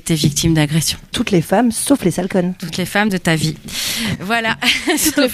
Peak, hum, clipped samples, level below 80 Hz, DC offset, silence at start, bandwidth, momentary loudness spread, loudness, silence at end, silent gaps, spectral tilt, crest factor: 0 dBFS; none; under 0.1%; -40 dBFS; under 0.1%; 0.05 s; 15.5 kHz; 6 LU; -16 LUFS; 0 s; none; -4 dB/octave; 16 dB